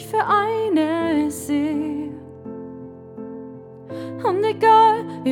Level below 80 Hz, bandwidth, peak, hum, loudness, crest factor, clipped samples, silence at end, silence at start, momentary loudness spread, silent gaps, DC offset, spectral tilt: -60 dBFS; 17 kHz; -4 dBFS; none; -19 LUFS; 16 dB; under 0.1%; 0 s; 0 s; 22 LU; none; under 0.1%; -5.5 dB/octave